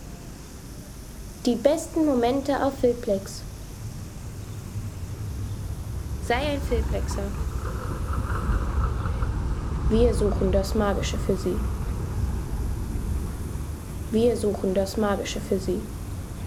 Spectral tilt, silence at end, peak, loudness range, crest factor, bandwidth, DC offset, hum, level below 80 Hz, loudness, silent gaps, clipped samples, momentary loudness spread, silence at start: -6.5 dB/octave; 0 s; -6 dBFS; 5 LU; 20 dB; 16 kHz; under 0.1%; none; -32 dBFS; -27 LUFS; none; under 0.1%; 14 LU; 0 s